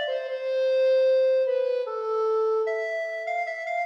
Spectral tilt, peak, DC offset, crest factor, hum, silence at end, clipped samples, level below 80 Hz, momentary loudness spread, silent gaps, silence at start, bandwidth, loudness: 0 dB/octave; -16 dBFS; under 0.1%; 8 dB; none; 0 s; under 0.1%; under -90 dBFS; 8 LU; none; 0 s; 7.4 kHz; -25 LUFS